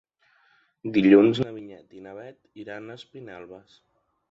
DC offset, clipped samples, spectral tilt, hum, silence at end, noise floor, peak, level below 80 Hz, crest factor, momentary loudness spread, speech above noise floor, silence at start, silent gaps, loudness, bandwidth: under 0.1%; under 0.1%; -8 dB/octave; none; 0.75 s; -64 dBFS; -4 dBFS; -66 dBFS; 22 dB; 27 LU; 39 dB; 0.85 s; none; -20 LUFS; 7.4 kHz